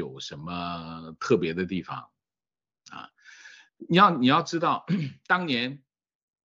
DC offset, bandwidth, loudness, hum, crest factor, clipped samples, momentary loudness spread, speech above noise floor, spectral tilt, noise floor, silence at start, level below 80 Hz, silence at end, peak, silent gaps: under 0.1%; 7.6 kHz; -25 LUFS; none; 24 dB; under 0.1%; 22 LU; over 64 dB; -5.5 dB/octave; under -90 dBFS; 0 s; -66 dBFS; 0.7 s; -4 dBFS; none